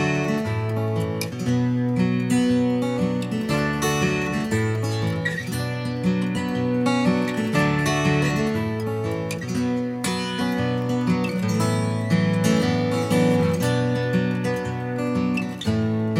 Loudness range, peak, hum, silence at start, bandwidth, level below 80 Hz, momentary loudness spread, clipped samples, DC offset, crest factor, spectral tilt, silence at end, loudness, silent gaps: 2 LU; -6 dBFS; none; 0 s; 16 kHz; -50 dBFS; 5 LU; under 0.1%; under 0.1%; 16 dB; -6 dB/octave; 0 s; -23 LUFS; none